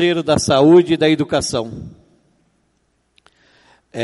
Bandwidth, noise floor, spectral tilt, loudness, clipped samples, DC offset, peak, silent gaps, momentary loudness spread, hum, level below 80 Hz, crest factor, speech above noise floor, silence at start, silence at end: 11.5 kHz; -64 dBFS; -5 dB/octave; -14 LUFS; under 0.1%; under 0.1%; 0 dBFS; none; 20 LU; none; -48 dBFS; 16 dB; 50 dB; 0 s; 0 s